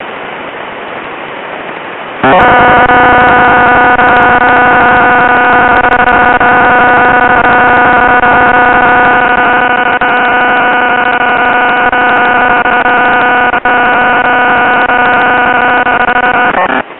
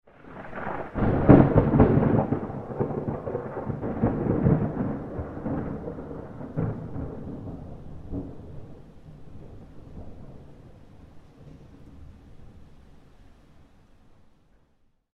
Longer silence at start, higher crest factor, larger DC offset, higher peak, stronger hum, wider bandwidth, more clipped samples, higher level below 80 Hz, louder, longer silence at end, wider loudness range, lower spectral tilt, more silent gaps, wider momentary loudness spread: second, 0 s vs 0.25 s; second, 6 dB vs 26 dB; neither; about the same, 0 dBFS vs 0 dBFS; neither; about the same, 4.2 kHz vs 4.3 kHz; neither; first, -32 dBFS vs -40 dBFS; first, -6 LUFS vs -25 LUFS; second, 0 s vs 1.95 s; second, 3 LU vs 26 LU; second, -7.5 dB/octave vs -11.5 dB/octave; neither; second, 15 LU vs 26 LU